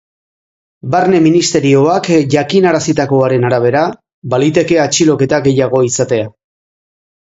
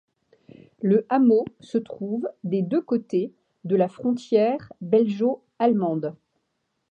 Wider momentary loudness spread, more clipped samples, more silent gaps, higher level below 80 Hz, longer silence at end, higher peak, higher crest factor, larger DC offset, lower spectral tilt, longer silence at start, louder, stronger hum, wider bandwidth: second, 7 LU vs 10 LU; neither; first, 4.14-4.22 s vs none; first, -50 dBFS vs -72 dBFS; first, 0.95 s vs 0.8 s; first, 0 dBFS vs -8 dBFS; about the same, 12 dB vs 16 dB; neither; second, -5 dB/octave vs -8.5 dB/octave; about the same, 0.85 s vs 0.8 s; first, -11 LUFS vs -24 LUFS; neither; about the same, 8 kHz vs 8.2 kHz